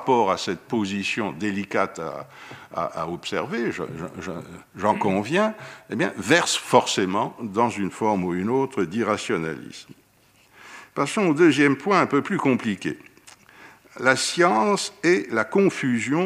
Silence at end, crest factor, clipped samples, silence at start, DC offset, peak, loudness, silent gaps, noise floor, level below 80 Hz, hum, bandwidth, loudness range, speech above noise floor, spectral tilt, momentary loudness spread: 0 s; 22 dB; under 0.1%; 0 s; under 0.1%; -2 dBFS; -23 LUFS; none; -58 dBFS; -64 dBFS; none; 15.5 kHz; 5 LU; 35 dB; -4.5 dB/octave; 15 LU